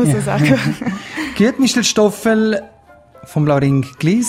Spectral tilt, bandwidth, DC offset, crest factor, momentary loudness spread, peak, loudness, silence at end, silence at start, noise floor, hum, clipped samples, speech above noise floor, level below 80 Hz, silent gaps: -5 dB/octave; 16 kHz; under 0.1%; 16 dB; 10 LU; 0 dBFS; -16 LUFS; 0 s; 0 s; -44 dBFS; none; under 0.1%; 29 dB; -48 dBFS; none